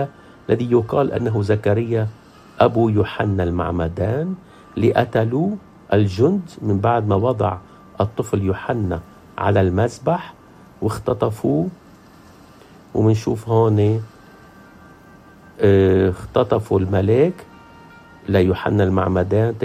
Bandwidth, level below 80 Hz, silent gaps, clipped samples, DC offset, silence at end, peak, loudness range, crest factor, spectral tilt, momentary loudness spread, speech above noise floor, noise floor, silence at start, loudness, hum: 14 kHz; -48 dBFS; none; under 0.1%; under 0.1%; 0 s; 0 dBFS; 3 LU; 18 dB; -8 dB/octave; 10 LU; 28 dB; -45 dBFS; 0 s; -19 LUFS; none